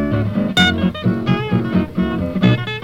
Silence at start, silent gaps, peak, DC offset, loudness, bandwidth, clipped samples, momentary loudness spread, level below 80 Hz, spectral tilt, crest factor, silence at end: 0 s; none; 0 dBFS; under 0.1%; -17 LUFS; 14 kHz; under 0.1%; 6 LU; -38 dBFS; -6.5 dB/octave; 16 dB; 0 s